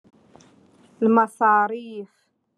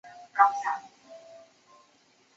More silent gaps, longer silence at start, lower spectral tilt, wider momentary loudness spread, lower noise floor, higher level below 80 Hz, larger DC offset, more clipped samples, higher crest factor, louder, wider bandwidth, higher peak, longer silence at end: neither; first, 1 s vs 0.05 s; first, -7 dB/octave vs 1 dB/octave; second, 18 LU vs 26 LU; second, -55 dBFS vs -64 dBFS; first, -80 dBFS vs -88 dBFS; neither; neither; second, 18 dB vs 24 dB; first, -20 LUFS vs -26 LUFS; first, 11.5 kHz vs 7.8 kHz; about the same, -6 dBFS vs -8 dBFS; second, 0.5 s vs 1 s